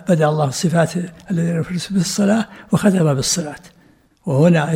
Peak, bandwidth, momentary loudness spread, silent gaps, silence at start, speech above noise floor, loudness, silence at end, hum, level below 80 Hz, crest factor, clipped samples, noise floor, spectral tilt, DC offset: -2 dBFS; 16 kHz; 9 LU; none; 0 s; 36 dB; -18 LUFS; 0 s; none; -50 dBFS; 16 dB; under 0.1%; -53 dBFS; -5.5 dB/octave; under 0.1%